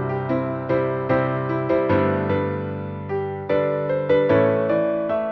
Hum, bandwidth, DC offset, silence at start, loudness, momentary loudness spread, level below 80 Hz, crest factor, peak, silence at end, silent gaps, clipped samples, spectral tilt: none; 5.8 kHz; under 0.1%; 0 s; -22 LUFS; 9 LU; -54 dBFS; 14 dB; -6 dBFS; 0 s; none; under 0.1%; -10 dB/octave